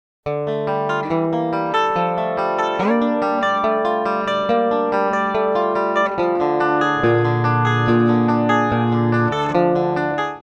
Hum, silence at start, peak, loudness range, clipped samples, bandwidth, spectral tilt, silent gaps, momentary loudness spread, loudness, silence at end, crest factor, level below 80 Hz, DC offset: none; 0.25 s; -2 dBFS; 2 LU; under 0.1%; 8.2 kHz; -7.5 dB/octave; none; 4 LU; -18 LUFS; 0.1 s; 16 dB; -52 dBFS; under 0.1%